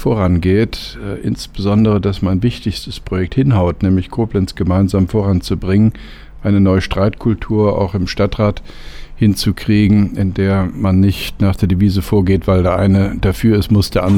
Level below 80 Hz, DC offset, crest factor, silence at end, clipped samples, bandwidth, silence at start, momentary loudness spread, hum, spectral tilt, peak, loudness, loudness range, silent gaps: -30 dBFS; under 0.1%; 10 dB; 0 s; under 0.1%; 16 kHz; 0 s; 9 LU; none; -7.5 dB/octave; -2 dBFS; -15 LUFS; 2 LU; none